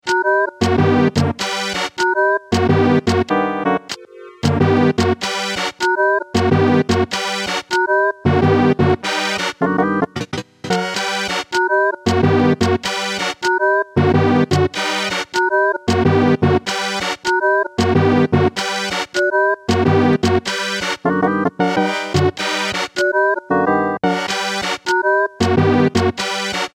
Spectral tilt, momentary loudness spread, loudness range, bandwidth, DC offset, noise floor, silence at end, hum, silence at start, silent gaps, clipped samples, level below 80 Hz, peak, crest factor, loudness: -5 dB/octave; 6 LU; 2 LU; 16 kHz; under 0.1%; -37 dBFS; 0.1 s; none; 0.05 s; none; under 0.1%; -44 dBFS; -2 dBFS; 14 dB; -17 LUFS